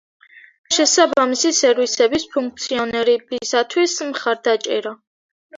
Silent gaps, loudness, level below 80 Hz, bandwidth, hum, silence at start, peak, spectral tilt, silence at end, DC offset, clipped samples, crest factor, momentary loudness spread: 0.58-0.64 s, 5.07-5.49 s; -18 LUFS; -60 dBFS; 7.8 kHz; none; 0.35 s; -2 dBFS; -1 dB/octave; 0 s; under 0.1%; under 0.1%; 16 dB; 9 LU